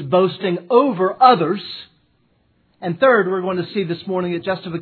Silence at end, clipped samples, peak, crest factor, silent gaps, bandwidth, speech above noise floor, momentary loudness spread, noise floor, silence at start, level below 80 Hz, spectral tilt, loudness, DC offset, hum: 0 s; under 0.1%; 0 dBFS; 18 dB; none; 4.6 kHz; 44 dB; 13 LU; -61 dBFS; 0 s; -66 dBFS; -9.5 dB/octave; -18 LUFS; under 0.1%; none